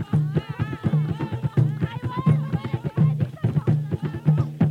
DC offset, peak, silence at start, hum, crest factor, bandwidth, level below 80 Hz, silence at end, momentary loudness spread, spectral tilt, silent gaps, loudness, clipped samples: under 0.1%; -6 dBFS; 0 s; none; 16 dB; 4.6 kHz; -48 dBFS; 0 s; 6 LU; -9.5 dB/octave; none; -24 LUFS; under 0.1%